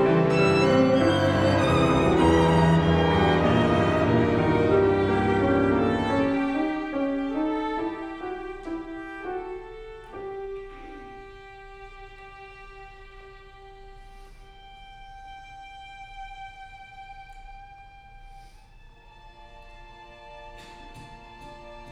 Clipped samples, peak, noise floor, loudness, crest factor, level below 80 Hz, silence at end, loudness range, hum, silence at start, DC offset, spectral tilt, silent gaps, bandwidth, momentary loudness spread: under 0.1%; -8 dBFS; -50 dBFS; -23 LUFS; 18 dB; -44 dBFS; 0 s; 26 LU; none; 0 s; under 0.1%; -7 dB/octave; none; 11 kHz; 25 LU